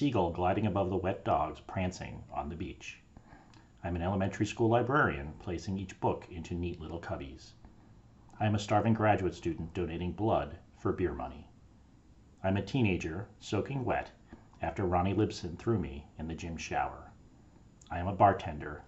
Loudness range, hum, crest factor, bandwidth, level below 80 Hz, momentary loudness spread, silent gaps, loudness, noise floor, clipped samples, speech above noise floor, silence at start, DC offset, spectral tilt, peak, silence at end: 4 LU; none; 22 dB; 8.2 kHz; -52 dBFS; 14 LU; none; -33 LUFS; -59 dBFS; under 0.1%; 27 dB; 0 s; under 0.1%; -7 dB/octave; -12 dBFS; 0 s